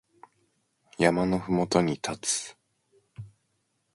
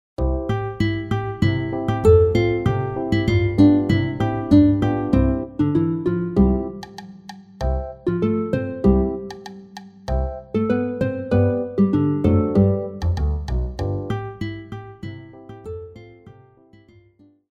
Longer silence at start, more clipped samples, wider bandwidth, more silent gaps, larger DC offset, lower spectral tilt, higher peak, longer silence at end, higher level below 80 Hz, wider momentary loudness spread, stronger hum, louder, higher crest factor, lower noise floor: first, 1 s vs 0.2 s; neither; first, 11.5 kHz vs 7.6 kHz; neither; neither; second, -4.5 dB/octave vs -9 dB/octave; second, -6 dBFS vs -2 dBFS; second, 0.65 s vs 1.2 s; second, -58 dBFS vs -32 dBFS; first, 23 LU vs 20 LU; neither; second, -27 LUFS vs -20 LUFS; first, 24 dB vs 18 dB; first, -75 dBFS vs -55 dBFS